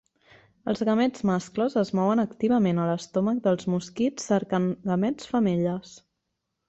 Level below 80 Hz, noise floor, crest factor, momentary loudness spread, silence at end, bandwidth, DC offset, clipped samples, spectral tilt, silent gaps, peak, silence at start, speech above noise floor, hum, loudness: -62 dBFS; -80 dBFS; 14 dB; 5 LU; 0.7 s; 8.2 kHz; under 0.1%; under 0.1%; -7 dB/octave; none; -10 dBFS; 0.65 s; 56 dB; none; -26 LUFS